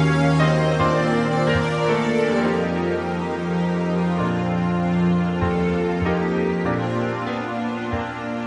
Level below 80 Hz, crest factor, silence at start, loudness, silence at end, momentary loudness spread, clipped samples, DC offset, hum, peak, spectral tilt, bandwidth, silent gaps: -44 dBFS; 14 dB; 0 s; -21 LUFS; 0 s; 7 LU; under 0.1%; under 0.1%; none; -6 dBFS; -7 dB/octave; 10.5 kHz; none